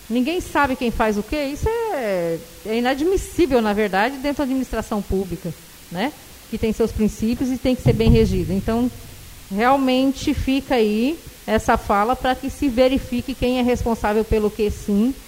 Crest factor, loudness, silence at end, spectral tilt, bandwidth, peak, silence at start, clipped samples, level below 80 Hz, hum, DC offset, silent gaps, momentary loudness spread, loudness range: 18 dB; -21 LUFS; 0 s; -6 dB/octave; 16 kHz; -2 dBFS; 0 s; under 0.1%; -34 dBFS; none; under 0.1%; none; 9 LU; 4 LU